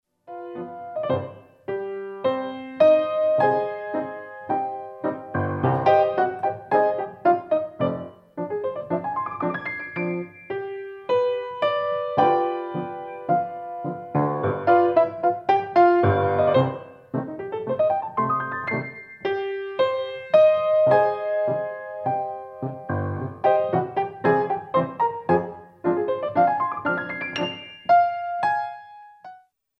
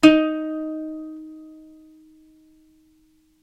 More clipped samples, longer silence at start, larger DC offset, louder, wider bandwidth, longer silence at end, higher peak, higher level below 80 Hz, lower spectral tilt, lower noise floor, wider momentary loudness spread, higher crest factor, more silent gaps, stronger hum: neither; first, 0.3 s vs 0 s; neither; about the same, -23 LUFS vs -23 LUFS; second, 6 kHz vs 11 kHz; second, 0.4 s vs 1.9 s; second, -6 dBFS vs 0 dBFS; second, -66 dBFS vs -56 dBFS; first, -8.5 dB/octave vs -4.5 dB/octave; second, -50 dBFS vs -60 dBFS; second, 14 LU vs 25 LU; second, 18 dB vs 24 dB; neither; neither